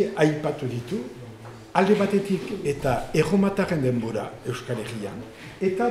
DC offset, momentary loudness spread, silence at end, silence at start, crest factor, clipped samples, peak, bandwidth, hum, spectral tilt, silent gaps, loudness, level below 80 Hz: under 0.1%; 16 LU; 0 s; 0 s; 18 dB; under 0.1%; -6 dBFS; 14.5 kHz; none; -6.5 dB/octave; none; -25 LUFS; -50 dBFS